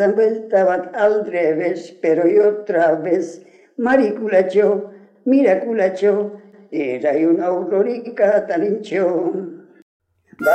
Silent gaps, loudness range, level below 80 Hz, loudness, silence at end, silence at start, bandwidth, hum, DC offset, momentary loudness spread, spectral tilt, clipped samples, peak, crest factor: 9.82-10.00 s; 2 LU; -70 dBFS; -18 LUFS; 0 s; 0 s; 12.5 kHz; none; under 0.1%; 9 LU; -7 dB/octave; under 0.1%; -4 dBFS; 14 dB